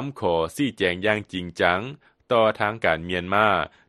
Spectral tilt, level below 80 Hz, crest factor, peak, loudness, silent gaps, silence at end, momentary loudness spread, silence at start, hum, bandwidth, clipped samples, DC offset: -5.5 dB/octave; -54 dBFS; 20 dB; -2 dBFS; -23 LUFS; none; 0.2 s; 6 LU; 0 s; none; 12.5 kHz; under 0.1%; under 0.1%